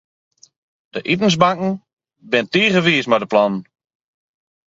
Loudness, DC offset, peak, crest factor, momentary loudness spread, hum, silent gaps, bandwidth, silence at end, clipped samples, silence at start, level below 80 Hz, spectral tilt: -17 LUFS; under 0.1%; 0 dBFS; 20 dB; 14 LU; none; 1.93-1.97 s; 7.8 kHz; 1.05 s; under 0.1%; 0.95 s; -58 dBFS; -5 dB/octave